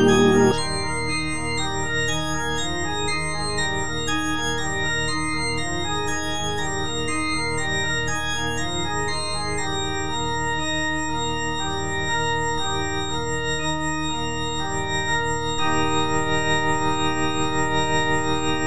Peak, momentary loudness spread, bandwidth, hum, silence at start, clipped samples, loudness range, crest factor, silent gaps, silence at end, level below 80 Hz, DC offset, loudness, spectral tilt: -6 dBFS; 4 LU; 10.5 kHz; none; 0 s; under 0.1%; 2 LU; 18 dB; none; 0 s; -40 dBFS; 3%; -23 LUFS; -3.5 dB/octave